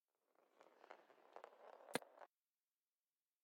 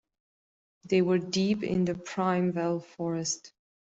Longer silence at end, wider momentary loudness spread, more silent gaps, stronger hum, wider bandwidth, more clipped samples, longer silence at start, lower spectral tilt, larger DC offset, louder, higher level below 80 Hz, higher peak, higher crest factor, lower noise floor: first, 1.15 s vs 0.5 s; first, 16 LU vs 7 LU; neither; neither; about the same, 8 kHz vs 8.2 kHz; neither; second, 0.4 s vs 0.85 s; second, -2 dB/octave vs -5.5 dB/octave; neither; second, -56 LUFS vs -29 LUFS; second, under -90 dBFS vs -66 dBFS; second, -26 dBFS vs -14 dBFS; first, 34 dB vs 16 dB; about the same, under -90 dBFS vs under -90 dBFS